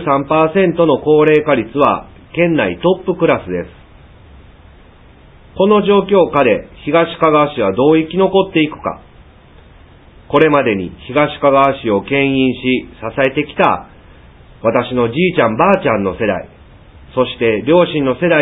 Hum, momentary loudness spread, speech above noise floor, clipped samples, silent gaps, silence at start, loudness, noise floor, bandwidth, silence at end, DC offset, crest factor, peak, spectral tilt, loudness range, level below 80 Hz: none; 8 LU; 29 dB; under 0.1%; none; 0 s; -14 LUFS; -42 dBFS; 4 kHz; 0 s; under 0.1%; 14 dB; 0 dBFS; -9 dB/octave; 4 LU; -42 dBFS